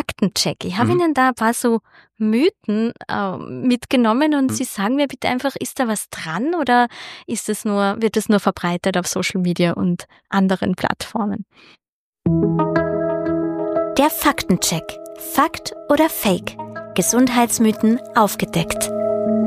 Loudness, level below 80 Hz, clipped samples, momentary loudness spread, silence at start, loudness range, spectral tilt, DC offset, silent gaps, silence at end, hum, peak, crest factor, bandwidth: -19 LUFS; -50 dBFS; under 0.1%; 8 LU; 0.1 s; 3 LU; -4.5 dB/octave; under 0.1%; 11.89-12.13 s; 0 s; none; -2 dBFS; 18 dB; 15.5 kHz